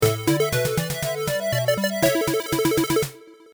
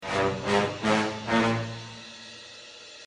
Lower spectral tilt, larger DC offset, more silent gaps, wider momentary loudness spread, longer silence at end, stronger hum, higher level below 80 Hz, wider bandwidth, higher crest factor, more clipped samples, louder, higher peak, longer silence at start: about the same, -4.5 dB/octave vs -5 dB/octave; neither; neither; second, 4 LU vs 18 LU; first, 0.2 s vs 0 s; neither; first, -48 dBFS vs -58 dBFS; first, over 20 kHz vs 11 kHz; about the same, 18 dB vs 20 dB; neither; first, -22 LUFS vs -26 LUFS; first, -4 dBFS vs -8 dBFS; about the same, 0 s vs 0 s